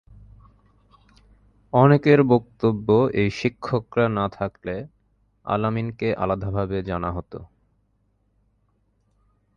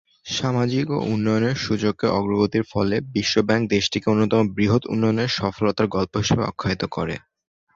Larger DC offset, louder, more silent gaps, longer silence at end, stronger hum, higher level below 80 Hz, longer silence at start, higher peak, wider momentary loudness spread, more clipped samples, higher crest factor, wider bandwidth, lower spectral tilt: neither; about the same, -22 LUFS vs -22 LUFS; neither; first, 2.1 s vs 0.6 s; neither; about the same, -48 dBFS vs -48 dBFS; first, 1.75 s vs 0.25 s; about the same, -2 dBFS vs -4 dBFS; first, 16 LU vs 5 LU; neither; about the same, 22 dB vs 18 dB; about the same, 7.2 kHz vs 7.6 kHz; first, -8.5 dB/octave vs -5.5 dB/octave